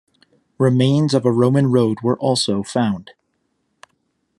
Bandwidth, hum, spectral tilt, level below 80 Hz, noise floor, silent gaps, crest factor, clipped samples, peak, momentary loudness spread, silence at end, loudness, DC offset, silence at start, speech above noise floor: 11.5 kHz; none; -6.5 dB/octave; -62 dBFS; -69 dBFS; none; 16 dB; under 0.1%; -2 dBFS; 5 LU; 1.35 s; -17 LUFS; under 0.1%; 0.6 s; 53 dB